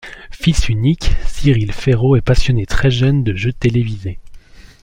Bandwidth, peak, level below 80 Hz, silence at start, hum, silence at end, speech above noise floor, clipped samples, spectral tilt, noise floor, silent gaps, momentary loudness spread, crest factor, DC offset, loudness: 11 kHz; -2 dBFS; -22 dBFS; 0.05 s; none; 0.2 s; 24 dB; under 0.1%; -6.5 dB/octave; -37 dBFS; none; 9 LU; 14 dB; under 0.1%; -16 LUFS